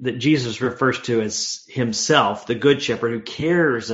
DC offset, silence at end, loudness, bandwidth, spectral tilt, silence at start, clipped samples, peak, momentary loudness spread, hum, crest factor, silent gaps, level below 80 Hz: under 0.1%; 0 s; -20 LUFS; 8 kHz; -4 dB/octave; 0 s; under 0.1%; 0 dBFS; 7 LU; none; 20 dB; none; -58 dBFS